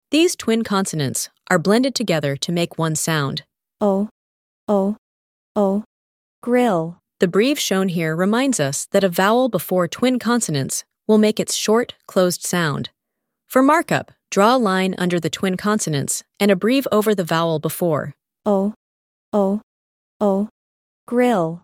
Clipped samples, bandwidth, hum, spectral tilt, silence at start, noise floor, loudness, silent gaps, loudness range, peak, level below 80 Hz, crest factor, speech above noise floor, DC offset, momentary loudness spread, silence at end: under 0.1%; 17 kHz; none; -4.5 dB/octave; 0.1 s; -79 dBFS; -19 LUFS; 4.11-4.67 s, 4.98-5.55 s, 5.86-6.42 s, 18.76-19.32 s, 19.63-20.20 s, 20.51-21.07 s; 4 LU; 0 dBFS; -62 dBFS; 20 dB; 61 dB; under 0.1%; 8 LU; 0.05 s